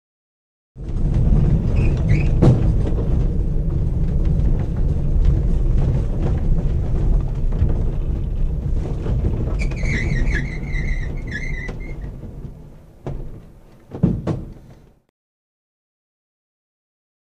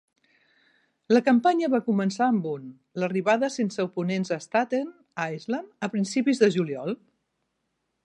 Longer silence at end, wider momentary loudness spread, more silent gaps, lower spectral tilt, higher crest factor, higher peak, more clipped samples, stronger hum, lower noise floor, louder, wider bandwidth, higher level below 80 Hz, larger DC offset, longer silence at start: first, 2.6 s vs 1.1 s; first, 15 LU vs 11 LU; neither; first, -8.5 dB/octave vs -6 dB/octave; about the same, 18 dB vs 18 dB; first, 0 dBFS vs -8 dBFS; neither; neither; second, -46 dBFS vs -78 dBFS; first, -21 LUFS vs -25 LUFS; second, 7.2 kHz vs 10.5 kHz; first, -22 dBFS vs -78 dBFS; first, 0.2% vs under 0.1%; second, 0.75 s vs 1.1 s